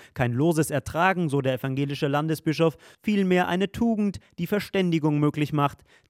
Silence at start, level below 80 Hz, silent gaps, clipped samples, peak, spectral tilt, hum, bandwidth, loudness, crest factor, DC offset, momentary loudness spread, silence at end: 0 s; -56 dBFS; none; under 0.1%; -6 dBFS; -6.5 dB/octave; none; 16.5 kHz; -25 LUFS; 18 dB; under 0.1%; 5 LU; 0.35 s